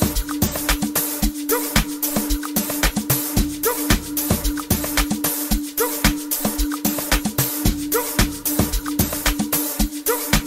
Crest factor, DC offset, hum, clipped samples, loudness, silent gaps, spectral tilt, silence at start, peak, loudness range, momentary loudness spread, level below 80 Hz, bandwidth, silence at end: 20 dB; under 0.1%; none; under 0.1%; -20 LUFS; none; -3.5 dB/octave; 0 s; -2 dBFS; 0 LU; 3 LU; -28 dBFS; 16.5 kHz; 0 s